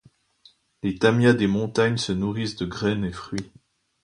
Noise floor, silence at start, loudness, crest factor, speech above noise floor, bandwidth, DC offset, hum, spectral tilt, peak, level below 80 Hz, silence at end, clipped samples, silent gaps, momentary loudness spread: -58 dBFS; 0.85 s; -23 LUFS; 20 dB; 35 dB; 11 kHz; under 0.1%; none; -6 dB/octave; -4 dBFS; -50 dBFS; 0.6 s; under 0.1%; none; 14 LU